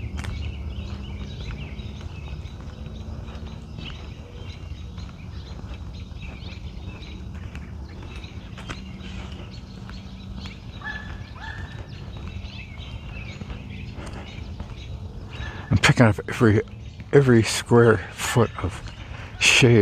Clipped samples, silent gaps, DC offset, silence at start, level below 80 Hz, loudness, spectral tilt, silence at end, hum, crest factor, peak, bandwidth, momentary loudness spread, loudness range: under 0.1%; none; under 0.1%; 0 s; -38 dBFS; -23 LUFS; -5 dB/octave; 0 s; none; 24 dB; -2 dBFS; 15 kHz; 20 LU; 17 LU